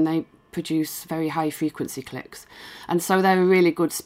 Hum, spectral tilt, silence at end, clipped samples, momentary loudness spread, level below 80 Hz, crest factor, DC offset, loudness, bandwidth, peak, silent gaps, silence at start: none; -5.5 dB/octave; 0.05 s; under 0.1%; 20 LU; -64 dBFS; 18 dB; under 0.1%; -23 LUFS; 16 kHz; -6 dBFS; none; 0 s